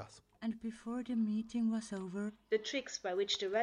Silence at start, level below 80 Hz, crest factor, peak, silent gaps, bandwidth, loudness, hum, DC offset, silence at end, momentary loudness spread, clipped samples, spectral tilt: 0 s; -74 dBFS; 16 dB; -22 dBFS; none; 10.5 kHz; -38 LUFS; none; under 0.1%; 0 s; 8 LU; under 0.1%; -4.5 dB/octave